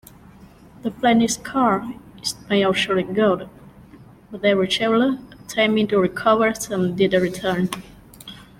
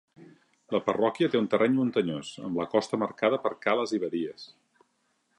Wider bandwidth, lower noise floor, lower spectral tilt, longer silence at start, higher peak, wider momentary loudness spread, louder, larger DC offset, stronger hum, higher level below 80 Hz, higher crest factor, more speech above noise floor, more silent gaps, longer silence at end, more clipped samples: first, 16.5 kHz vs 10.5 kHz; second, -46 dBFS vs -73 dBFS; second, -4.5 dB/octave vs -6 dB/octave; first, 0.4 s vs 0.2 s; first, -4 dBFS vs -10 dBFS; first, 13 LU vs 9 LU; first, -20 LUFS vs -28 LUFS; neither; neither; first, -52 dBFS vs -70 dBFS; about the same, 18 dB vs 18 dB; second, 26 dB vs 46 dB; neither; second, 0.15 s vs 0.95 s; neither